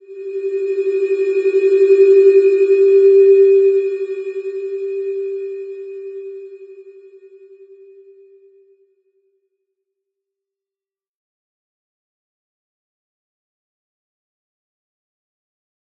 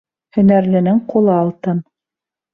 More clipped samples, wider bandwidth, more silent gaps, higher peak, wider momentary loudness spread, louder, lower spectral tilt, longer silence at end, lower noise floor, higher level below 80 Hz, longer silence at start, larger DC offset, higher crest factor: neither; first, 4.5 kHz vs 3.6 kHz; neither; about the same, -2 dBFS vs -2 dBFS; first, 21 LU vs 10 LU; about the same, -14 LUFS vs -15 LUFS; second, -5 dB/octave vs -11.5 dB/octave; first, 9.1 s vs 0.7 s; about the same, under -90 dBFS vs -87 dBFS; second, under -90 dBFS vs -54 dBFS; second, 0.1 s vs 0.35 s; neither; about the same, 16 dB vs 14 dB